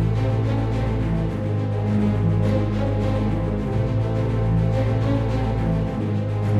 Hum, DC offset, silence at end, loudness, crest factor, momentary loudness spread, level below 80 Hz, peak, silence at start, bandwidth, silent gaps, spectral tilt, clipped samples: none; under 0.1%; 0 s; -22 LUFS; 12 dB; 3 LU; -30 dBFS; -8 dBFS; 0 s; 6.8 kHz; none; -9 dB/octave; under 0.1%